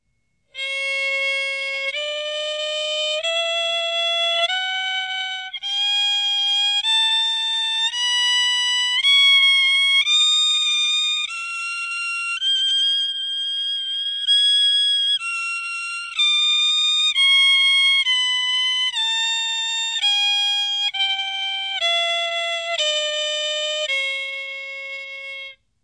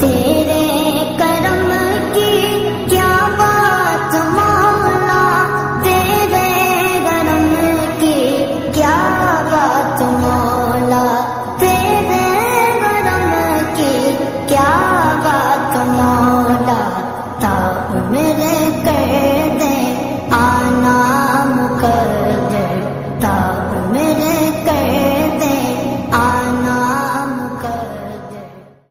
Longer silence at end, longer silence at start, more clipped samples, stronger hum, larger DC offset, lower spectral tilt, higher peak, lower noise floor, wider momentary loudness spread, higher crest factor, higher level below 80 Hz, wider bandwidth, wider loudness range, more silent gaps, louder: about the same, 0.3 s vs 0.25 s; first, 0.55 s vs 0 s; neither; neither; neither; second, 5 dB/octave vs -5 dB/octave; second, -6 dBFS vs 0 dBFS; first, -70 dBFS vs -37 dBFS; first, 11 LU vs 6 LU; about the same, 14 dB vs 14 dB; second, -74 dBFS vs -40 dBFS; second, 11 kHz vs 16.5 kHz; first, 6 LU vs 3 LU; neither; second, -17 LUFS vs -14 LUFS